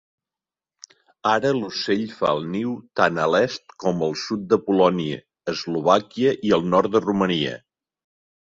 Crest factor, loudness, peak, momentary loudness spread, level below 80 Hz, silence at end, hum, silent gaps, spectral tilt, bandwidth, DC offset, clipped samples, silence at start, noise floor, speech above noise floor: 20 dB; -22 LUFS; -2 dBFS; 9 LU; -60 dBFS; 0.9 s; none; none; -5.5 dB/octave; 7.8 kHz; under 0.1%; under 0.1%; 1.25 s; under -90 dBFS; over 69 dB